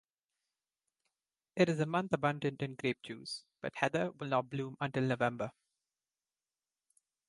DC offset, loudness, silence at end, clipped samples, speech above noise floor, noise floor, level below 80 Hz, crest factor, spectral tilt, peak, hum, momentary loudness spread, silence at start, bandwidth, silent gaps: under 0.1%; -36 LUFS; 1.8 s; under 0.1%; over 55 dB; under -90 dBFS; -76 dBFS; 24 dB; -6 dB/octave; -14 dBFS; none; 11 LU; 1.55 s; 11.5 kHz; none